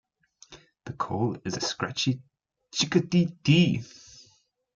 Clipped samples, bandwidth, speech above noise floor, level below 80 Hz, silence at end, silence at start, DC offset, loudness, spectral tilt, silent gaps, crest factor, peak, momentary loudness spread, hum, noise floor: under 0.1%; 7.6 kHz; 39 dB; -62 dBFS; 0.8 s; 0.5 s; under 0.1%; -26 LUFS; -5 dB/octave; none; 20 dB; -8 dBFS; 20 LU; none; -65 dBFS